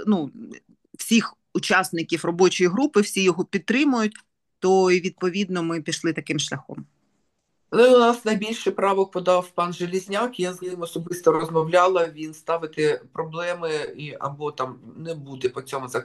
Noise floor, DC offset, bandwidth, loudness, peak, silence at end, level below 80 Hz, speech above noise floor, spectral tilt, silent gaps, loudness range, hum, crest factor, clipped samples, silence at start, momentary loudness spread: -73 dBFS; under 0.1%; 12.5 kHz; -22 LUFS; -4 dBFS; 0 s; -70 dBFS; 51 dB; -4.5 dB/octave; none; 4 LU; none; 20 dB; under 0.1%; 0 s; 13 LU